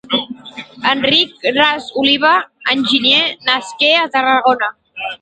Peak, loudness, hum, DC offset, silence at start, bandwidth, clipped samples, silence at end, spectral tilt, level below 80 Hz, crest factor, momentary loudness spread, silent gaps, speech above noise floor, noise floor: 0 dBFS; -13 LUFS; none; under 0.1%; 0.05 s; 9.2 kHz; under 0.1%; 0.05 s; -3 dB/octave; -58 dBFS; 16 dB; 11 LU; none; 19 dB; -34 dBFS